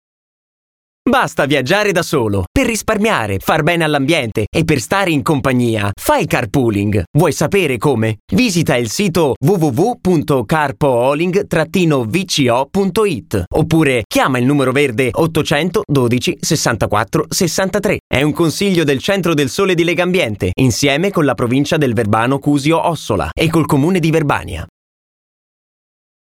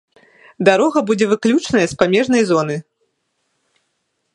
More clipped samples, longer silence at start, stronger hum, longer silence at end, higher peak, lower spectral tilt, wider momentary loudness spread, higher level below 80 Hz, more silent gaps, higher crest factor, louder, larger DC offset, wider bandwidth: neither; first, 1.05 s vs 0.6 s; neither; about the same, 1.6 s vs 1.55 s; about the same, 0 dBFS vs 0 dBFS; about the same, -5 dB/octave vs -5 dB/octave; about the same, 3 LU vs 4 LU; first, -38 dBFS vs -56 dBFS; first, 2.47-2.55 s, 4.47-4.52 s, 7.07-7.14 s, 8.20-8.28 s, 9.36-9.41 s, 13.47-13.51 s, 14.05-14.10 s, 18.00-18.10 s vs none; about the same, 14 dB vs 18 dB; about the same, -15 LUFS vs -15 LUFS; neither; first, 18 kHz vs 11 kHz